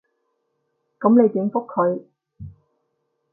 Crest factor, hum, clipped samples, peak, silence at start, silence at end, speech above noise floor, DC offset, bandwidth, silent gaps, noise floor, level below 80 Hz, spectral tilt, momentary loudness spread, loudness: 18 dB; none; under 0.1%; -4 dBFS; 1 s; 0.85 s; 55 dB; under 0.1%; 2.3 kHz; none; -73 dBFS; -58 dBFS; -14.5 dB/octave; 8 LU; -19 LUFS